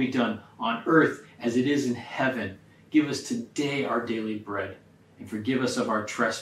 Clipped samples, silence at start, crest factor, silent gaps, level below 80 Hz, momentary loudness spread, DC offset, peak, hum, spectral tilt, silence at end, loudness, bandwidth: under 0.1%; 0 s; 20 dB; none; -72 dBFS; 11 LU; under 0.1%; -8 dBFS; none; -5 dB/octave; 0 s; -27 LUFS; 14 kHz